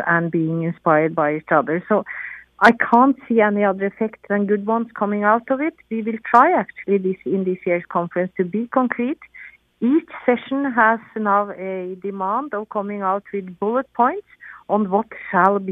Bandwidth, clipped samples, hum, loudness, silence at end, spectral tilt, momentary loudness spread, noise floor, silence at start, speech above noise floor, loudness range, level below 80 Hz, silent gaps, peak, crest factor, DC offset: 9.4 kHz; under 0.1%; none; -20 LUFS; 0 s; -8.5 dB/octave; 11 LU; -43 dBFS; 0 s; 24 dB; 5 LU; -64 dBFS; none; 0 dBFS; 20 dB; under 0.1%